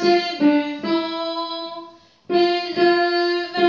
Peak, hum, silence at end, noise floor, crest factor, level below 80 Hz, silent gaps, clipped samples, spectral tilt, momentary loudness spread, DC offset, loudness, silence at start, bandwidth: -6 dBFS; none; 0 s; -43 dBFS; 14 dB; -70 dBFS; none; under 0.1%; -5 dB/octave; 10 LU; under 0.1%; -20 LUFS; 0 s; 7.2 kHz